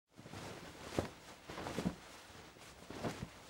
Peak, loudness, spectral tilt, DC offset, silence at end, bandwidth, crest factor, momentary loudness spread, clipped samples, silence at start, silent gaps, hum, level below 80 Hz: -18 dBFS; -47 LUFS; -5 dB/octave; under 0.1%; 0 s; 19.5 kHz; 28 dB; 13 LU; under 0.1%; 0.1 s; none; none; -64 dBFS